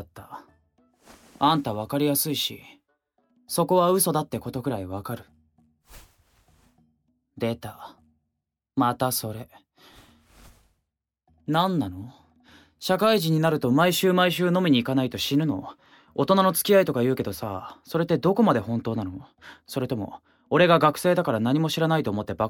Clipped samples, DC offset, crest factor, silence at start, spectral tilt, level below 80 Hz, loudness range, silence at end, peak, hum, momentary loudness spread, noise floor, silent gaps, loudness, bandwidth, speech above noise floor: under 0.1%; under 0.1%; 20 dB; 0 s; -5 dB/octave; -60 dBFS; 10 LU; 0 s; -6 dBFS; none; 17 LU; -82 dBFS; none; -24 LUFS; 19 kHz; 59 dB